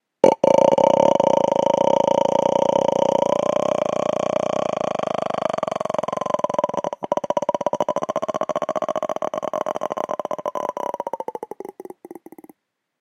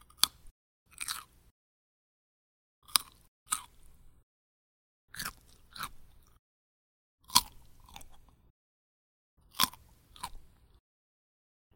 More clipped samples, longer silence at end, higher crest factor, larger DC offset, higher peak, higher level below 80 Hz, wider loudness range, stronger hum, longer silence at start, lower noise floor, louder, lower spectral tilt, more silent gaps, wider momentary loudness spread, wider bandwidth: neither; second, 0.85 s vs 1.3 s; second, 20 dB vs 40 dB; neither; about the same, 0 dBFS vs 0 dBFS; about the same, -64 dBFS vs -60 dBFS; about the same, 10 LU vs 8 LU; neither; about the same, 0.25 s vs 0.2 s; about the same, -60 dBFS vs -57 dBFS; first, -21 LUFS vs -32 LUFS; first, -5.5 dB/octave vs 0.5 dB/octave; second, none vs 0.51-0.86 s, 1.51-2.82 s, 3.28-3.46 s, 4.23-5.08 s, 6.39-7.18 s, 8.50-9.37 s; second, 13 LU vs 25 LU; second, 11 kHz vs 17 kHz